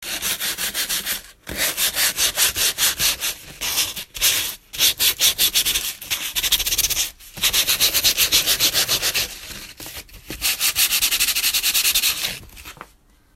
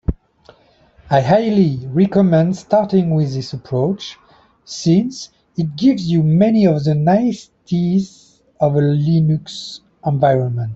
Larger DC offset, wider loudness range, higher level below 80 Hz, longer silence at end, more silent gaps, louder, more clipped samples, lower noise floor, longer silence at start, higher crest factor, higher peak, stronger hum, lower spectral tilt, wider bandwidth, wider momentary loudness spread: neither; about the same, 2 LU vs 3 LU; about the same, -44 dBFS vs -40 dBFS; first, 0.5 s vs 0 s; neither; about the same, -18 LUFS vs -16 LUFS; neither; about the same, -54 dBFS vs -51 dBFS; about the same, 0 s vs 0.1 s; first, 20 dB vs 14 dB; about the same, -2 dBFS vs -2 dBFS; neither; second, 1 dB/octave vs -8 dB/octave; first, 16.5 kHz vs 7.8 kHz; second, 11 LU vs 15 LU